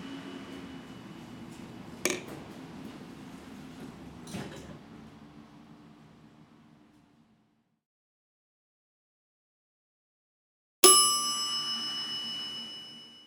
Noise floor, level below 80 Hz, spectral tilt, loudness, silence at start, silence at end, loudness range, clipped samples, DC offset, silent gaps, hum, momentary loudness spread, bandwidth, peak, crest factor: -71 dBFS; -68 dBFS; -1 dB/octave; -25 LUFS; 0 s; 0 s; 22 LU; under 0.1%; under 0.1%; 7.86-10.83 s; none; 26 LU; 19 kHz; -2 dBFS; 32 dB